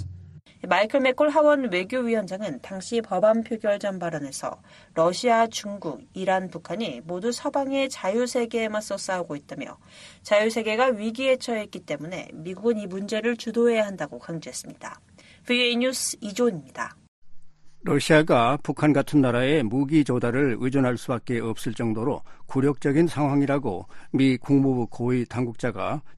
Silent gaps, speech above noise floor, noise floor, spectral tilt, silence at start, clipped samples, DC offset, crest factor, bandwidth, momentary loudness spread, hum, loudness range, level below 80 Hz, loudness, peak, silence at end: 17.08-17.22 s; 22 dB; -46 dBFS; -5.5 dB/octave; 0 s; under 0.1%; under 0.1%; 20 dB; 12.5 kHz; 14 LU; none; 5 LU; -58 dBFS; -24 LUFS; -4 dBFS; 0 s